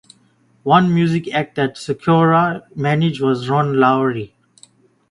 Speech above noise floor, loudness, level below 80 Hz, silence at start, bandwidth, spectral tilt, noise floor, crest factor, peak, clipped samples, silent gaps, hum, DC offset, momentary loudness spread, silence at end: 40 dB; -17 LUFS; -54 dBFS; 0.65 s; 11 kHz; -7.5 dB/octave; -56 dBFS; 18 dB; 0 dBFS; under 0.1%; none; none; under 0.1%; 9 LU; 0.85 s